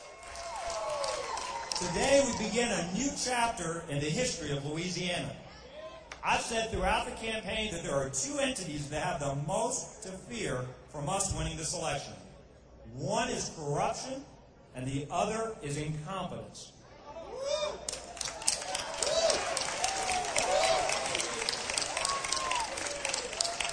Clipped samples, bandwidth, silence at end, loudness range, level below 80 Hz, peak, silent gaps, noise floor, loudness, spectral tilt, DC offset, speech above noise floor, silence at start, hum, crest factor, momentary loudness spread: under 0.1%; 10.5 kHz; 0 s; 6 LU; -52 dBFS; -6 dBFS; none; -54 dBFS; -32 LUFS; -3 dB/octave; under 0.1%; 21 dB; 0 s; none; 28 dB; 13 LU